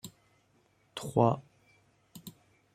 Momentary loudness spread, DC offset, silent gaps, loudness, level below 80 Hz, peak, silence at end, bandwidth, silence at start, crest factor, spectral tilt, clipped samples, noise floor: 24 LU; under 0.1%; none; -30 LUFS; -70 dBFS; -10 dBFS; 0.45 s; 15.5 kHz; 0.05 s; 26 dB; -7 dB/octave; under 0.1%; -69 dBFS